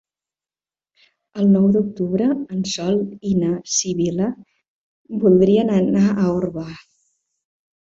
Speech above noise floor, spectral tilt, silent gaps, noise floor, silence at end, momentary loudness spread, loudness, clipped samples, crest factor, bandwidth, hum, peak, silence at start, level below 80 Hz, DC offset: over 72 dB; -6 dB/octave; 4.68-5.05 s; under -90 dBFS; 1.05 s; 12 LU; -18 LUFS; under 0.1%; 16 dB; 7.8 kHz; none; -4 dBFS; 1.35 s; -54 dBFS; under 0.1%